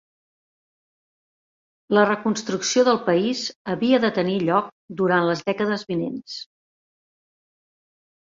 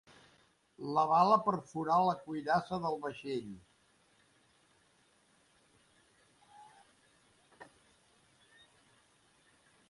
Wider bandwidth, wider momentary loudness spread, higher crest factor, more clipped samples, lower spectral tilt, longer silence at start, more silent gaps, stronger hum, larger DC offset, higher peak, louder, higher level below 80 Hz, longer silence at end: second, 7.8 kHz vs 11.5 kHz; second, 10 LU vs 14 LU; second, 18 dB vs 24 dB; neither; second, -4.5 dB/octave vs -6.5 dB/octave; first, 1.9 s vs 0.8 s; first, 3.56-3.65 s, 4.72-4.88 s vs none; neither; neither; first, -4 dBFS vs -14 dBFS; first, -22 LUFS vs -32 LUFS; first, -66 dBFS vs -76 dBFS; second, 1.9 s vs 2.25 s